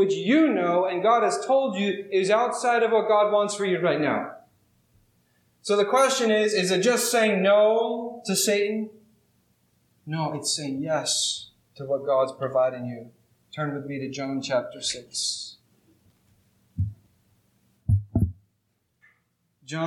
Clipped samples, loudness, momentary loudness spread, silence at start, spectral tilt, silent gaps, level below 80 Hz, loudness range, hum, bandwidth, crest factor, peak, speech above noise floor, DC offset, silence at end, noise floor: under 0.1%; -24 LUFS; 13 LU; 0 s; -4 dB/octave; none; -50 dBFS; 10 LU; none; 17 kHz; 18 dB; -8 dBFS; 50 dB; under 0.1%; 0 s; -73 dBFS